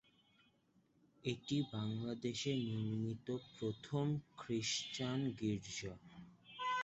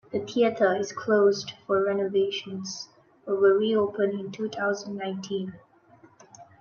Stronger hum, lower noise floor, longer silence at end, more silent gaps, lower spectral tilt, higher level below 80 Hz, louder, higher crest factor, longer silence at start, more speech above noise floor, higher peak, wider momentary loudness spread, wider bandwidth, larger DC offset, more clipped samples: neither; first, -75 dBFS vs -56 dBFS; second, 0 s vs 0.2 s; neither; about the same, -5 dB/octave vs -5 dB/octave; about the same, -72 dBFS vs -74 dBFS; second, -42 LUFS vs -26 LUFS; about the same, 18 dB vs 18 dB; first, 1.25 s vs 0.1 s; about the same, 34 dB vs 31 dB; second, -24 dBFS vs -10 dBFS; second, 7 LU vs 13 LU; first, 8 kHz vs 7 kHz; neither; neither